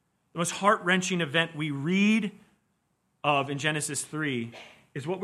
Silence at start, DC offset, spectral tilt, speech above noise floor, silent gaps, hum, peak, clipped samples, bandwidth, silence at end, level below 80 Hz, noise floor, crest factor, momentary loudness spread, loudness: 0.35 s; under 0.1%; -4 dB/octave; 47 dB; none; none; -8 dBFS; under 0.1%; 13.5 kHz; 0 s; -74 dBFS; -74 dBFS; 22 dB; 14 LU; -27 LUFS